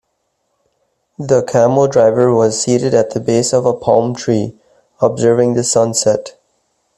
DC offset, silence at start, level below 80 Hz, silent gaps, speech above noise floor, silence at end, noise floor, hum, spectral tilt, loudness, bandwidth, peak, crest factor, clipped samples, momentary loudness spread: under 0.1%; 1.2 s; -54 dBFS; none; 55 dB; 0.7 s; -67 dBFS; none; -5 dB/octave; -13 LUFS; 12.5 kHz; 0 dBFS; 14 dB; under 0.1%; 6 LU